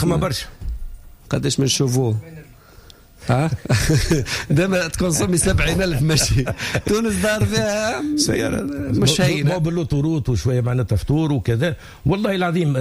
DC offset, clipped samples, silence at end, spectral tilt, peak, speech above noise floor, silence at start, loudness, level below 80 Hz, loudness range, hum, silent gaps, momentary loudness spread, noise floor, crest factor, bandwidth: under 0.1%; under 0.1%; 0 s; -5 dB/octave; -6 dBFS; 26 dB; 0 s; -19 LUFS; -34 dBFS; 3 LU; none; none; 7 LU; -45 dBFS; 14 dB; 16 kHz